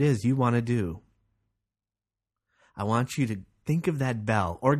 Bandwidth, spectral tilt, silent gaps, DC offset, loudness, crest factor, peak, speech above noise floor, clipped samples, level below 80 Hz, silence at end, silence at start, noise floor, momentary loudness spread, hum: 13.5 kHz; -7 dB/octave; none; under 0.1%; -28 LUFS; 20 dB; -8 dBFS; over 64 dB; under 0.1%; -56 dBFS; 0 s; 0 s; under -90 dBFS; 11 LU; none